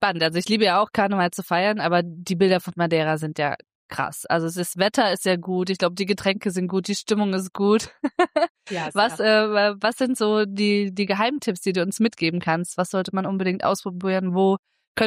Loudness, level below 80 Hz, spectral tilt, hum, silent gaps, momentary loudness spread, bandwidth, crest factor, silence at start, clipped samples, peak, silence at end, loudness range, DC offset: -22 LUFS; -64 dBFS; -5 dB/octave; none; 3.75-3.89 s, 8.50-8.55 s, 14.59-14.63 s, 14.87-14.95 s; 6 LU; 15.5 kHz; 14 dB; 0 s; under 0.1%; -8 dBFS; 0 s; 2 LU; under 0.1%